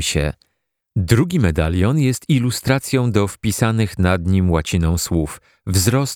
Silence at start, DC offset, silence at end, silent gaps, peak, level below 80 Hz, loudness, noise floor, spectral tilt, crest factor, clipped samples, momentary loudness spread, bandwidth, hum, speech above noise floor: 0 s; under 0.1%; 0 s; none; 0 dBFS; -32 dBFS; -18 LUFS; -72 dBFS; -5.5 dB/octave; 18 dB; under 0.1%; 7 LU; 19.5 kHz; none; 55 dB